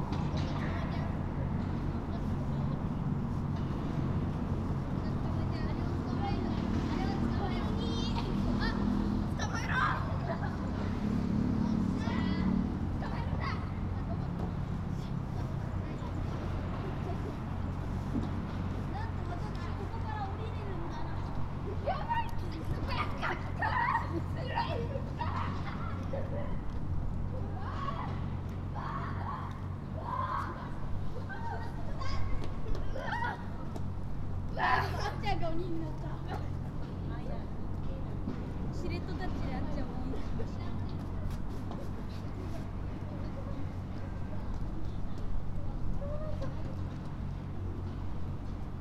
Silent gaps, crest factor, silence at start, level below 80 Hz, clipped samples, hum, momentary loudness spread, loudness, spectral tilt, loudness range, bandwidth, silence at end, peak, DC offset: none; 18 dB; 0 s; -42 dBFS; under 0.1%; none; 8 LU; -36 LUFS; -7.5 dB/octave; 7 LU; 11.5 kHz; 0 s; -14 dBFS; under 0.1%